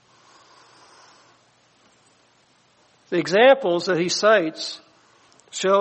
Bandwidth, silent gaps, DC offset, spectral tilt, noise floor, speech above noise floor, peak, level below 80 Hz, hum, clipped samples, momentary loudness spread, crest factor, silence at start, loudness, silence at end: 8.4 kHz; none; under 0.1%; -3.5 dB/octave; -60 dBFS; 41 dB; -4 dBFS; -74 dBFS; none; under 0.1%; 16 LU; 20 dB; 3.1 s; -19 LUFS; 0 s